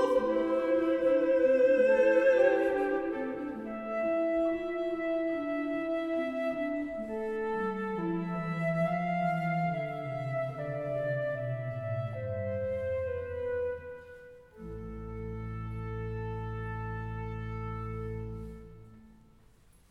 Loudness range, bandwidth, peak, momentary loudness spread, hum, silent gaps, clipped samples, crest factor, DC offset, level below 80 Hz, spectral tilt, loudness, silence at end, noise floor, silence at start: 12 LU; 8.2 kHz; -14 dBFS; 15 LU; none; none; under 0.1%; 18 dB; under 0.1%; -52 dBFS; -8.5 dB/octave; -31 LUFS; 0.8 s; -60 dBFS; 0 s